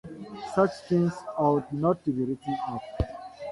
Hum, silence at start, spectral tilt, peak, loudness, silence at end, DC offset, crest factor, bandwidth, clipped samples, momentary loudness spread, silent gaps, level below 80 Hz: none; 0.05 s; -8 dB/octave; -10 dBFS; -28 LUFS; 0 s; under 0.1%; 18 dB; 11.5 kHz; under 0.1%; 9 LU; none; -46 dBFS